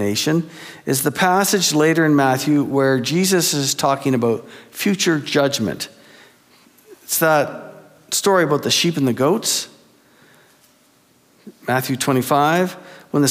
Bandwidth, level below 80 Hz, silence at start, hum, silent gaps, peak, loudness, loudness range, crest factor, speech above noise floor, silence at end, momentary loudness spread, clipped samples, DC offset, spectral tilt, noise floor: 16.5 kHz; -66 dBFS; 0 s; none; none; -4 dBFS; -18 LUFS; 6 LU; 16 dB; 38 dB; 0 s; 11 LU; under 0.1%; under 0.1%; -4 dB/octave; -56 dBFS